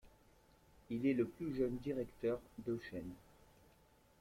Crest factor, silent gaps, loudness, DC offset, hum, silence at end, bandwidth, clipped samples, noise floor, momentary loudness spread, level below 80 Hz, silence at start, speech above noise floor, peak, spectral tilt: 18 dB; none; -41 LUFS; under 0.1%; none; 1 s; 16 kHz; under 0.1%; -69 dBFS; 12 LU; -66 dBFS; 0.05 s; 29 dB; -26 dBFS; -8 dB/octave